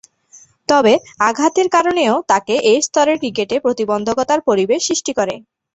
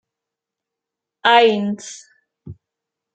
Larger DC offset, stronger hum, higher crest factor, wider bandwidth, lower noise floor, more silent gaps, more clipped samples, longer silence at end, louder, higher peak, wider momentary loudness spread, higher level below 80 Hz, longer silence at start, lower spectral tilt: neither; neither; about the same, 16 dB vs 20 dB; about the same, 8.4 kHz vs 9 kHz; second, -47 dBFS vs -85 dBFS; neither; neither; second, 0.35 s vs 0.6 s; about the same, -15 LUFS vs -15 LUFS; about the same, 0 dBFS vs -2 dBFS; second, 5 LU vs 22 LU; first, -56 dBFS vs -66 dBFS; second, 0.7 s vs 1.25 s; about the same, -3 dB/octave vs -4 dB/octave